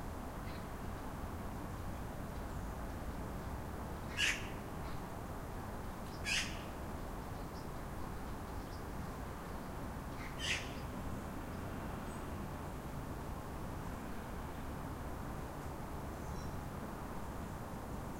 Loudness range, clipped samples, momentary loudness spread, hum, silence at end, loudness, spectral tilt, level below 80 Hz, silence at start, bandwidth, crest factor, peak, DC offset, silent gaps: 5 LU; under 0.1%; 8 LU; none; 0 s; -44 LUFS; -4.5 dB/octave; -50 dBFS; 0 s; 16 kHz; 22 dB; -22 dBFS; under 0.1%; none